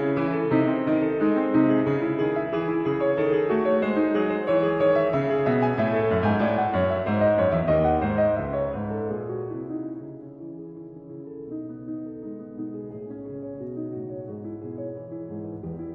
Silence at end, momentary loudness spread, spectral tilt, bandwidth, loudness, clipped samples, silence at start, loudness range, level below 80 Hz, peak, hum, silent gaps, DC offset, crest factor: 0 s; 16 LU; -10 dB/octave; 5.6 kHz; -24 LUFS; under 0.1%; 0 s; 14 LU; -50 dBFS; -8 dBFS; none; none; under 0.1%; 16 dB